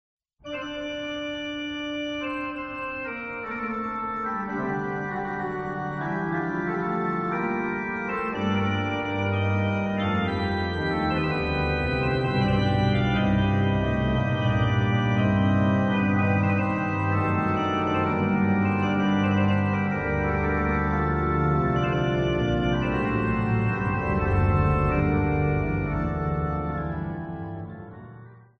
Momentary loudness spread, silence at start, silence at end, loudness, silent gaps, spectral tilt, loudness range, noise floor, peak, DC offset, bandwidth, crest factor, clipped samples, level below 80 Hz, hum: 9 LU; 0.45 s; 0.2 s; -25 LUFS; none; -8 dB/octave; 7 LU; -46 dBFS; -10 dBFS; under 0.1%; 6.6 kHz; 14 dB; under 0.1%; -38 dBFS; none